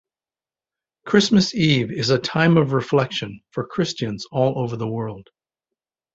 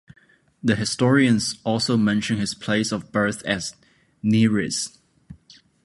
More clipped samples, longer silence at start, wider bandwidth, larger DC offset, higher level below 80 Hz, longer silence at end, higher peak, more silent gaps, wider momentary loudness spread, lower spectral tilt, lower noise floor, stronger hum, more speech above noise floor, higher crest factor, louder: neither; first, 1.05 s vs 0.65 s; second, 8 kHz vs 11.5 kHz; neither; about the same, -56 dBFS vs -56 dBFS; first, 0.95 s vs 0.5 s; about the same, -2 dBFS vs -4 dBFS; neither; first, 13 LU vs 9 LU; about the same, -5.5 dB/octave vs -5 dB/octave; first, under -90 dBFS vs -53 dBFS; neither; first, over 70 dB vs 32 dB; about the same, 20 dB vs 18 dB; about the same, -20 LUFS vs -22 LUFS